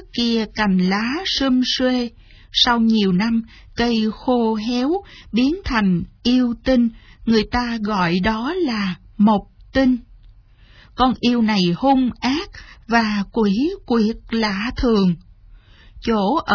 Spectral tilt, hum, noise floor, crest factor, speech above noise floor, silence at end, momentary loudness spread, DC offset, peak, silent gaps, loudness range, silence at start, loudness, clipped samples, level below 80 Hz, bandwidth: -6 dB/octave; none; -48 dBFS; 16 dB; 29 dB; 0 s; 6 LU; under 0.1%; -2 dBFS; none; 2 LU; 0 s; -19 LUFS; under 0.1%; -40 dBFS; 5.4 kHz